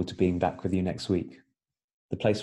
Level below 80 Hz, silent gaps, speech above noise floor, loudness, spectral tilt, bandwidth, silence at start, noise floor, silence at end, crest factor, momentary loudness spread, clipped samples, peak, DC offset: -54 dBFS; 1.84-2.09 s; 54 dB; -29 LUFS; -7 dB/octave; 11.5 kHz; 0 s; -82 dBFS; 0 s; 18 dB; 9 LU; under 0.1%; -10 dBFS; under 0.1%